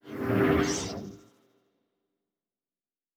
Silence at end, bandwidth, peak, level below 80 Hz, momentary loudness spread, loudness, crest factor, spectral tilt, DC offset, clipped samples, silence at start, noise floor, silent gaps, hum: 2 s; 17.5 kHz; -12 dBFS; -52 dBFS; 16 LU; -27 LUFS; 20 dB; -5 dB/octave; under 0.1%; under 0.1%; 0.05 s; under -90 dBFS; none; none